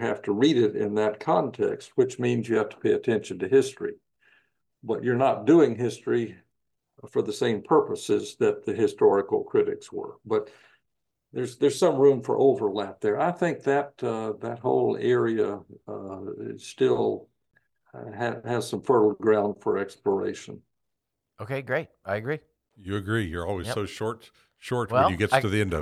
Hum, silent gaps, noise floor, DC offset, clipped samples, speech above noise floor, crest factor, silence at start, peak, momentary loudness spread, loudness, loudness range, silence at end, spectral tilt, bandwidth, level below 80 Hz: none; none; -83 dBFS; under 0.1%; under 0.1%; 58 dB; 22 dB; 0 s; -4 dBFS; 15 LU; -25 LUFS; 6 LU; 0 s; -6 dB/octave; 12.5 kHz; -60 dBFS